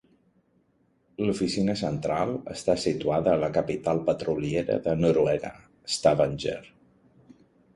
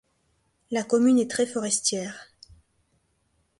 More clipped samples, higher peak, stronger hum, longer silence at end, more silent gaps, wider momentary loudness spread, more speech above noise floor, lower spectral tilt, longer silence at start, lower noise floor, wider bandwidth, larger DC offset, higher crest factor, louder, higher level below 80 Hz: neither; about the same, -8 dBFS vs -10 dBFS; neither; second, 1.05 s vs 1.35 s; neither; second, 9 LU vs 14 LU; second, 42 dB vs 46 dB; first, -6 dB/octave vs -3 dB/octave; first, 1.2 s vs 0.7 s; about the same, -67 dBFS vs -70 dBFS; about the same, 11.5 kHz vs 11.5 kHz; neither; about the same, 20 dB vs 18 dB; about the same, -26 LUFS vs -24 LUFS; first, -54 dBFS vs -66 dBFS